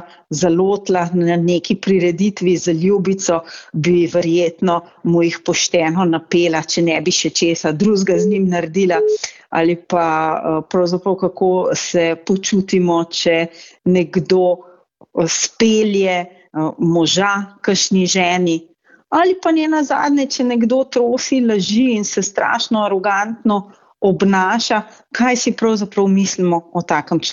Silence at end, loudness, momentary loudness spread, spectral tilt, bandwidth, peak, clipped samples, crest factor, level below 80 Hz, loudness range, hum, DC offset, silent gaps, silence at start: 0 s; -16 LUFS; 5 LU; -4.5 dB/octave; 7.8 kHz; -2 dBFS; under 0.1%; 14 dB; -58 dBFS; 1 LU; none; under 0.1%; none; 0 s